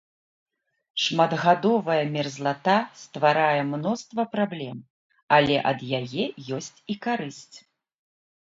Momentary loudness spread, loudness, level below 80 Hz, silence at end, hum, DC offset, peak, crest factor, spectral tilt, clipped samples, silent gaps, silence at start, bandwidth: 14 LU; -24 LUFS; -66 dBFS; 0.85 s; none; under 0.1%; -4 dBFS; 22 dB; -5 dB/octave; under 0.1%; 4.90-5.10 s, 5.23-5.28 s; 0.95 s; 7.8 kHz